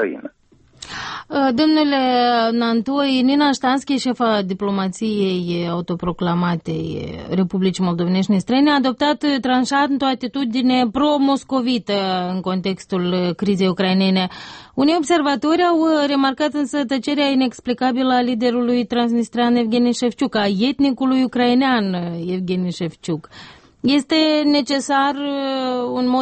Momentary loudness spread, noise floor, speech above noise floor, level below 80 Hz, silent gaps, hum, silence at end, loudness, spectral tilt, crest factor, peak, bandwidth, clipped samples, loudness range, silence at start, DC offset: 8 LU; -53 dBFS; 35 dB; -54 dBFS; none; none; 0 s; -18 LUFS; -5.5 dB/octave; 12 dB; -6 dBFS; 8.8 kHz; under 0.1%; 3 LU; 0 s; under 0.1%